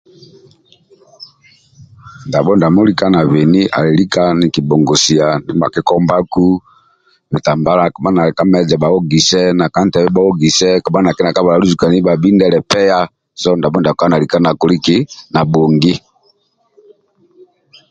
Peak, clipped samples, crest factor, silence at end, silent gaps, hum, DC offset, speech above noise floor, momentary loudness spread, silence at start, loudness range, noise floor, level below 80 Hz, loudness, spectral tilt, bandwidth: 0 dBFS; under 0.1%; 12 dB; 1.9 s; none; none; under 0.1%; 46 dB; 5 LU; 1.2 s; 3 LU; -57 dBFS; -44 dBFS; -12 LUFS; -5.5 dB/octave; 9.2 kHz